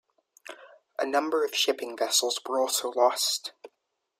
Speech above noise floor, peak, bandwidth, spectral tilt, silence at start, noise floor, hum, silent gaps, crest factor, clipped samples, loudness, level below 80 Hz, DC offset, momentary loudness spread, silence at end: 53 dB; -10 dBFS; 16 kHz; 1 dB/octave; 0.5 s; -80 dBFS; none; none; 20 dB; under 0.1%; -26 LUFS; -84 dBFS; under 0.1%; 17 LU; 0.55 s